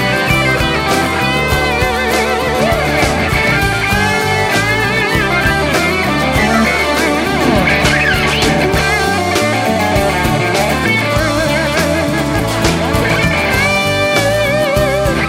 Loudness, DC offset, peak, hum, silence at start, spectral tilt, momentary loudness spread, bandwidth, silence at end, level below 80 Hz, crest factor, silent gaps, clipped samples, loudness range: -12 LUFS; under 0.1%; 0 dBFS; none; 0 s; -4.5 dB/octave; 2 LU; 16.5 kHz; 0 s; -26 dBFS; 12 dB; none; under 0.1%; 1 LU